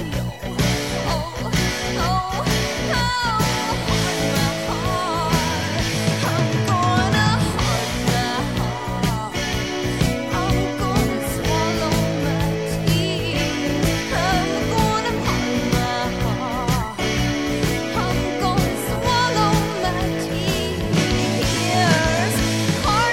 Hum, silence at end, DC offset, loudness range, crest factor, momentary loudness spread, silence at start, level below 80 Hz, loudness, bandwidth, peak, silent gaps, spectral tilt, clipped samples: none; 0 s; 0.4%; 2 LU; 16 dB; 5 LU; 0 s; -32 dBFS; -21 LUFS; 19 kHz; -4 dBFS; none; -4.5 dB/octave; under 0.1%